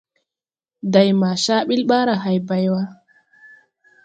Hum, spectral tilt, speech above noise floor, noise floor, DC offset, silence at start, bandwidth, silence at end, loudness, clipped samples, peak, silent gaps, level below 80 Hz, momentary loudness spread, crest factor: none; -5.5 dB/octave; over 73 dB; under -90 dBFS; under 0.1%; 0.85 s; 9 kHz; 1.1 s; -18 LUFS; under 0.1%; 0 dBFS; none; -66 dBFS; 8 LU; 20 dB